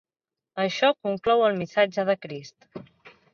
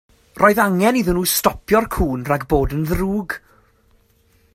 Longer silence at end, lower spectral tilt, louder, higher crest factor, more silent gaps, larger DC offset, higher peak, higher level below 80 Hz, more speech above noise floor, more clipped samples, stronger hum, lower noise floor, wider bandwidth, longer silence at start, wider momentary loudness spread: second, 0.25 s vs 1.15 s; about the same, -5 dB/octave vs -5 dB/octave; second, -24 LUFS vs -18 LUFS; about the same, 18 dB vs 20 dB; neither; neither; second, -8 dBFS vs 0 dBFS; second, -68 dBFS vs -34 dBFS; first, 65 dB vs 40 dB; neither; neither; first, -90 dBFS vs -57 dBFS; second, 7.2 kHz vs 16.5 kHz; first, 0.55 s vs 0.35 s; first, 22 LU vs 7 LU